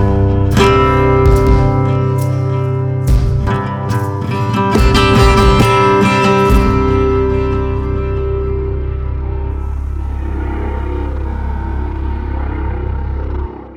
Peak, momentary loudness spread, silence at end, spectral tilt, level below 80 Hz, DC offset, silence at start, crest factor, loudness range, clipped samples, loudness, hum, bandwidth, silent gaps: 0 dBFS; 11 LU; 0 s; -7 dB/octave; -18 dBFS; under 0.1%; 0 s; 12 dB; 10 LU; under 0.1%; -14 LUFS; none; 15.5 kHz; none